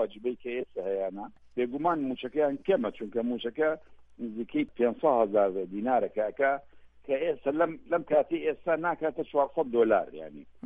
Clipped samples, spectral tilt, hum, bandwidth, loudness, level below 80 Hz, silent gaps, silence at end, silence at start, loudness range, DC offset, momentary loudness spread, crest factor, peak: under 0.1%; -8.5 dB/octave; none; 3.8 kHz; -29 LUFS; -64 dBFS; none; 0.15 s; 0 s; 3 LU; under 0.1%; 10 LU; 18 dB; -12 dBFS